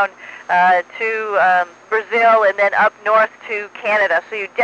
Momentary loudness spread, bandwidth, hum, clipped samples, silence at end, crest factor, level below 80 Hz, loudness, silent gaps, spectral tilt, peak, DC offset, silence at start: 9 LU; 8.4 kHz; none; under 0.1%; 0 s; 12 dB; -78 dBFS; -16 LUFS; none; -4 dB/octave; -4 dBFS; under 0.1%; 0 s